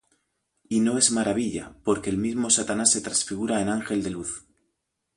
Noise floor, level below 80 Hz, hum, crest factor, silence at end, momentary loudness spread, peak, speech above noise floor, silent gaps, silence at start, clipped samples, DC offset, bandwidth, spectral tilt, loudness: -78 dBFS; -56 dBFS; none; 22 dB; 0.75 s; 11 LU; -6 dBFS; 54 dB; none; 0.7 s; under 0.1%; under 0.1%; 11.5 kHz; -3 dB/octave; -24 LUFS